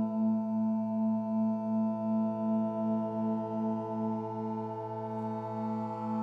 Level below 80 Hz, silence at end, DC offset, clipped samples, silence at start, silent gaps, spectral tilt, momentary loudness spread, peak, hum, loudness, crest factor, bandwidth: -82 dBFS; 0 s; under 0.1%; under 0.1%; 0 s; none; -10.5 dB/octave; 6 LU; -22 dBFS; none; -33 LUFS; 10 dB; 3.3 kHz